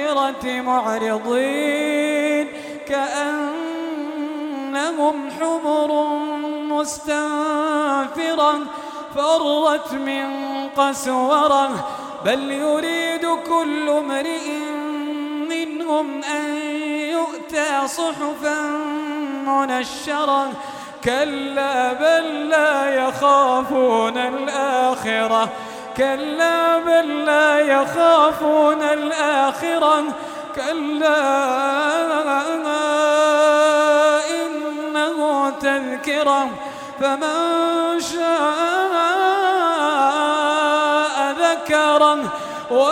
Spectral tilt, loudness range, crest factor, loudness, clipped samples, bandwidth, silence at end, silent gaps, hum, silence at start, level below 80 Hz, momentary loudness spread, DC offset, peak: -3 dB/octave; 6 LU; 16 dB; -19 LUFS; under 0.1%; 16.5 kHz; 0 s; none; none; 0 s; -62 dBFS; 10 LU; under 0.1%; -2 dBFS